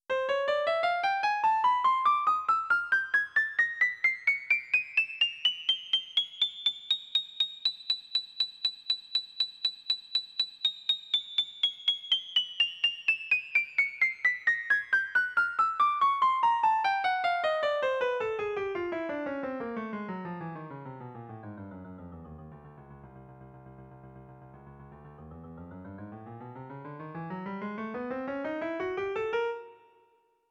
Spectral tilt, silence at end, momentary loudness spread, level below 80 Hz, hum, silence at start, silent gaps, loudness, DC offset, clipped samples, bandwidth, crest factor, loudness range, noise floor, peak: -3.5 dB/octave; 0.75 s; 19 LU; -68 dBFS; none; 0.1 s; none; -28 LUFS; under 0.1%; under 0.1%; 14.5 kHz; 16 dB; 19 LU; -68 dBFS; -16 dBFS